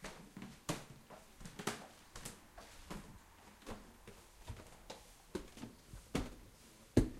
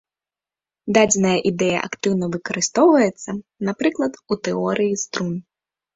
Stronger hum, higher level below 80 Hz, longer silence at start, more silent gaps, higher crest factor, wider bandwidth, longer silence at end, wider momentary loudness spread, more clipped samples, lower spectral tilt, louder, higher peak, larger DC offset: neither; about the same, -54 dBFS vs -58 dBFS; second, 0 s vs 0.85 s; neither; first, 30 dB vs 20 dB; first, 16 kHz vs 8 kHz; second, 0 s vs 0.55 s; first, 15 LU vs 12 LU; neither; about the same, -5 dB/octave vs -4.5 dB/octave; second, -48 LUFS vs -20 LUFS; second, -14 dBFS vs -2 dBFS; neither